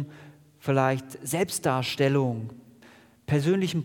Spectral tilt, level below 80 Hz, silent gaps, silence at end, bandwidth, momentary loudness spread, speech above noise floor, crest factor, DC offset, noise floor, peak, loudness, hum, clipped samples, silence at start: -5.5 dB/octave; -66 dBFS; none; 0 s; 18 kHz; 13 LU; 29 dB; 18 dB; under 0.1%; -54 dBFS; -8 dBFS; -26 LUFS; none; under 0.1%; 0 s